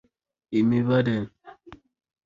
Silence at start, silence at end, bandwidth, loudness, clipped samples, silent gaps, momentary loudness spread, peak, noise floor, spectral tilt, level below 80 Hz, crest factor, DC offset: 0.5 s; 0.5 s; 7.2 kHz; -24 LUFS; under 0.1%; none; 9 LU; -10 dBFS; -49 dBFS; -9 dB/octave; -58 dBFS; 16 dB; under 0.1%